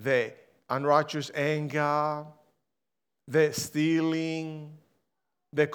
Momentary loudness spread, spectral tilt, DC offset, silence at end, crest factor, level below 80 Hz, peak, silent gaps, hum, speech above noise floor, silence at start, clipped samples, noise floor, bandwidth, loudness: 12 LU; -5.5 dB/octave; under 0.1%; 0 s; 20 dB; -78 dBFS; -8 dBFS; none; none; 61 dB; 0 s; under 0.1%; -88 dBFS; 20 kHz; -28 LUFS